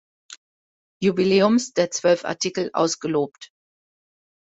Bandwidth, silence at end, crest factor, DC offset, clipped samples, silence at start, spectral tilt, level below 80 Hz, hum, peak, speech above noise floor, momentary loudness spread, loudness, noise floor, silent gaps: 8.4 kHz; 1.15 s; 18 dB; under 0.1%; under 0.1%; 0.3 s; -4.5 dB/octave; -66 dBFS; none; -6 dBFS; over 69 dB; 7 LU; -21 LUFS; under -90 dBFS; 0.37-1.00 s